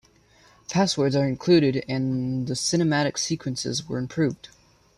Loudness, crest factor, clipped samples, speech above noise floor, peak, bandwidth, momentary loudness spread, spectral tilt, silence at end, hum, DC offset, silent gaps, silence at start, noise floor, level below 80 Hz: -24 LUFS; 16 dB; under 0.1%; 33 dB; -8 dBFS; 13 kHz; 9 LU; -5 dB/octave; 0.65 s; none; under 0.1%; none; 0.7 s; -57 dBFS; -58 dBFS